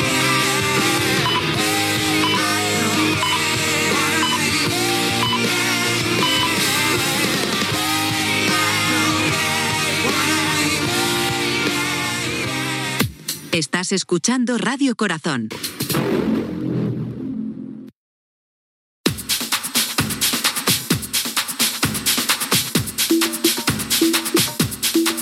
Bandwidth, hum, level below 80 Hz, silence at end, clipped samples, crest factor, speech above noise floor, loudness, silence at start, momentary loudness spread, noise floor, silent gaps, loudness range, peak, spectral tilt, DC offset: 16.5 kHz; none; -50 dBFS; 0 s; under 0.1%; 18 dB; over 70 dB; -18 LUFS; 0 s; 6 LU; under -90 dBFS; 17.95-19.04 s; 6 LU; -2 dBFS; -2.5 dB/octave; under 0.1%